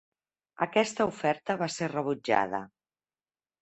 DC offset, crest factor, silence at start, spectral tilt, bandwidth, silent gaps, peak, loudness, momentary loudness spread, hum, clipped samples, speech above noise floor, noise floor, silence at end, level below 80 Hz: under 0.1%; 22 dB; 0.6 s; -4.5 dB/octave; 8.4 kHz; none; -8 dBFS; -29 LUFS; 6 LU; none; under 0.1%; over 61 dB; under -90 dBFS; 0.95 s; -70 dBFS